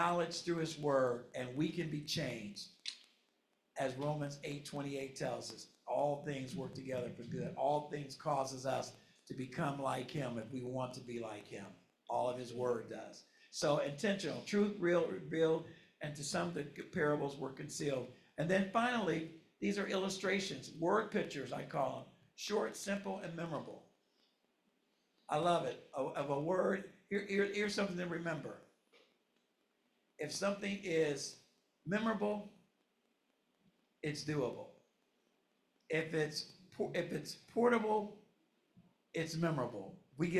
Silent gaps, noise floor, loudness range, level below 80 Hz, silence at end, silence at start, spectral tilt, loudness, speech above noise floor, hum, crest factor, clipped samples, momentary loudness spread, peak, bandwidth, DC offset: none; -80 dBFS; 6 LU; -76 dBFS; 0 s; 0 s; -5 dB/octave; -39 LUFS; 42 dB; none; 20 dB; under 0.1%; 13 LU; -20 dBFS; 14 kHz; under 0.1%